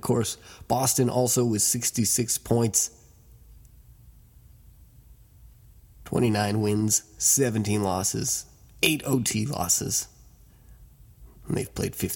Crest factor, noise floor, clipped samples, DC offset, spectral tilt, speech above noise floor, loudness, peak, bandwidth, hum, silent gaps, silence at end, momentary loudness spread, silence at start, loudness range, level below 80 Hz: 20 dB; -53 dBFS; under 0.1%; under 0.1%; -3.5 dB/octave; 28 dB; -24 LUFS; -8 dBFS; 17.5 kHz; none; none; 0 s; 9 LU; 0.05 s; 7 LU; -52 dBFS